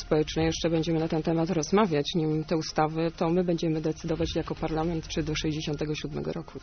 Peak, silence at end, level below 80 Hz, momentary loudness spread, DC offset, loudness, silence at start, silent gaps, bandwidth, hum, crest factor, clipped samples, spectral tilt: -10 dBFS; 0 s; -44 dBFS; 6 LU; under 0.1%; -28 LUFS; 0 s; none; 6.6 kHz; none; 18 dB; under 0.1%; -5.5 dB/octave